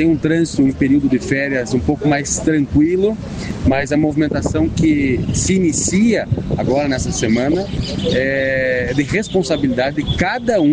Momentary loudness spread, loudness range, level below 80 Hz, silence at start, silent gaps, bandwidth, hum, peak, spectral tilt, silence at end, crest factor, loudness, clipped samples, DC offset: 4 LU; 1 LU; -32 dBFS; 0 s; none; 10 kHz; none; -2 dBFS; -5.5 dB/octave; 0 s; 14 dB; -16 LUFS; under 0.1%; under 0.1%